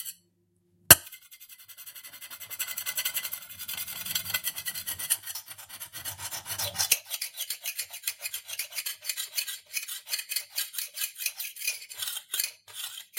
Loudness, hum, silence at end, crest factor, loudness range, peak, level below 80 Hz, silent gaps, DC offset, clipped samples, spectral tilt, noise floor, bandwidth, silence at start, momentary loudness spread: -29 LUFS; none; 0 s; 32 dB; 7 LU; 0 dBFS; -62 dBFS; none; under 0.1%; under 0.1%; 0 dB/octave; -70 dBFS; 17 kHz; 0 s; 16 LU